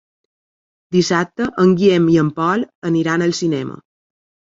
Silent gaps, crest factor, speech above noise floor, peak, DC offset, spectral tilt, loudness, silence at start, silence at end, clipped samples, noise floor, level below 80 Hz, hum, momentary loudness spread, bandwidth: 2.75-2.82 s; 16 dB; over 74 dB; -2 dBFS; under 0.1%; -6 dB/octave; -16 LUFS; 0.9 s; 0.8 s; under 0.1%; under -90 dBFS; -56 dBFS; none; 8 LU; 7.8 kHz